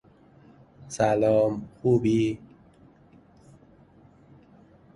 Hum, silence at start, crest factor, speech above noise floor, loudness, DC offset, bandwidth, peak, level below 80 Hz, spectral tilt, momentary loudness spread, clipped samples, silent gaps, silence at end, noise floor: none; 0.85 s; 20 dB; 32 dB; -24 LUFS; under 0.1%; 11.5 kHz; -8 dBFS; -58 dBFS; -7 dB/octave; 11 LU; under 0.1%; none; 2.6 s; -55 dBFS